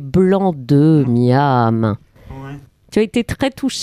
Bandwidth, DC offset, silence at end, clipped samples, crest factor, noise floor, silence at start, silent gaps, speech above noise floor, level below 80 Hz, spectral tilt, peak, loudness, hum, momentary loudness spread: 14.5 kHz; under 0.1%; 0 s; under 0.1%; 12 dB; -34 dBFS; 0 s; none; 20 dB; -42 dBFS; -7 dB/octave; -2 dBFS; -15 LUFS; none; 19 LU